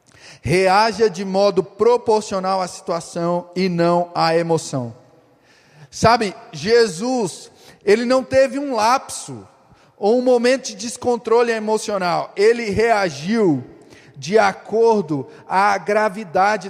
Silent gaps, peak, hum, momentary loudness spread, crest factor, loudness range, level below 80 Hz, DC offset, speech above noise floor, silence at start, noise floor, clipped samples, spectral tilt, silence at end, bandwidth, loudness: none; 0 dBFS; none; 10 LU; 18 dB; 2 LU; -54 dBFS; under 0.1%; 35 dB; 0.25 s; -53 dBFS; under 0.1%; -5 dB/octave; 0 s; 14.5 kHz; -18 LUFS